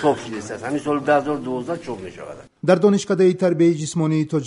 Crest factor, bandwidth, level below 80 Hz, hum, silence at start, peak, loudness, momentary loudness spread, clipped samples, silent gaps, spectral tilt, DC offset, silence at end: 16 dB; 11 kHz; -60 dBFS; none; 0 s; -2 dBFS; -20 LUFS; 15 LU; under 0.1%; none; -6.5 dB/octave; under 0.1%; 0 s